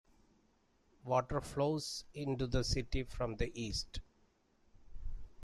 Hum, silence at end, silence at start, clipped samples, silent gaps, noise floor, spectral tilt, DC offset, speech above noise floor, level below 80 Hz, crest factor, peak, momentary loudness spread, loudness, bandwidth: none; 0 s; 1.05 s; under 0.1%; none; -73 dBFS; -5 dB/octave; under 0.1%; 36 dB; -48 dBFS; 20 dB; -20 dBFS; 17 LU; -38 LUFS; 14 kHz